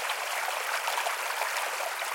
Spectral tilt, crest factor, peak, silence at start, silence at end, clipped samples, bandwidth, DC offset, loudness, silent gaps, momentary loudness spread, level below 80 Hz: 3 dB/octave; 16 dB; -16 dBFS; 0 s; 0 s; under 0.1%; 17 kHz; under 0.1%; -30 LUFS; none; 1 LU; -90 dBFS